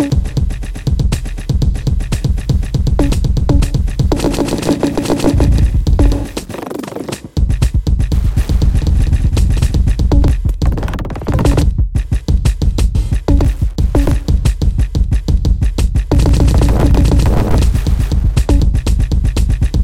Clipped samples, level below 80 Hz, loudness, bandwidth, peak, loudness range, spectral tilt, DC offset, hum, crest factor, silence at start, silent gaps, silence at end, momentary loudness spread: under 0.1%; -14 dBFS; -15 LUFS; 14 kHz; 0 dBFS; 3 LU; -7 dB/octave; 2%; none; 12 dB; 0 s; none; 0 s; 7 LU